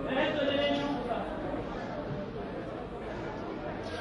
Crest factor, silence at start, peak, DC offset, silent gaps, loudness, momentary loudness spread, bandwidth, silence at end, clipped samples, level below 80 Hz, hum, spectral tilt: 16 dB; 0 s; -18 dBFS; under 0.1%; none; -34 LUFS; 10 LU; 11 kHz; 0 s; under 0.1%; -52 dBFS; none; -6.5 dB/octave